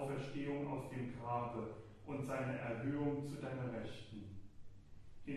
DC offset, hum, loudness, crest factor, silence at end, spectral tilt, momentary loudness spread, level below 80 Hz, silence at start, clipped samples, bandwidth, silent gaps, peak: under 0.1%; none; -44 LUFS; 16 dB; 0 s; -7.5 dB/octave; 16 LU; -66 dBFS; 0 s; under 0.1%; 13 kHz; none; -28 dBFS